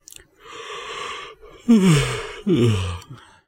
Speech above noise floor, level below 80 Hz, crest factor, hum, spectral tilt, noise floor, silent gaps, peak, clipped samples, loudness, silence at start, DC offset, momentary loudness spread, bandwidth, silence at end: 28 dB; -44 dBFS; 16 dB; none; -6 dB/octave; -45 dBFS; none; -4 dBFS; under 0.1%; -20 LUFS; 0.45 s; under 0.1%; 21 LU; 16 kHz; 0.3 s